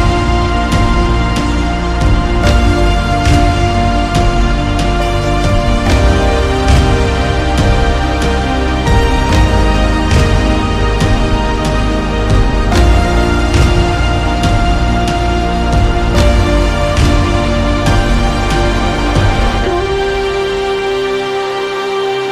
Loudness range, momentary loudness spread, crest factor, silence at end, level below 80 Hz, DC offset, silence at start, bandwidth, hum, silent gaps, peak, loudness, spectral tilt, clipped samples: 1 LU; 4 LU; 10 dB; 0 s; -14 dBFS; under 0.1%; 0 s; 12.5 kHz; none; none; 0 dBFS; -13 LUFS; -6 dB/octave; under 0.1%